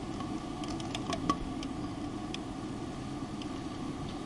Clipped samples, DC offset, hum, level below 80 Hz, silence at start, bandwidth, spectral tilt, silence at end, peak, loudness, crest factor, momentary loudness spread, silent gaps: under 0.1%; under 0.1%; none; -50 dBFS; 0 s; 11.5 kHz; -5.5 dB/octave; 0 s; -12 dBFS; -38 LUFS; 24 dB; 6 LU; none